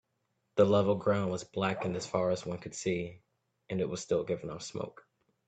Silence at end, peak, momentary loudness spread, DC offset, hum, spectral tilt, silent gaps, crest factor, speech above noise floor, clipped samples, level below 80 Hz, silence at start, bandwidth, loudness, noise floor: 0.6 s; -12 dBFS; 13 LU; under 0.1%; none; -5.5 dB/octave; none; 20 dB; 48 dB; under 0.1%; -66 dBFS; 0.55 s; 9 kHz; -32 LUFS; -80 dBFS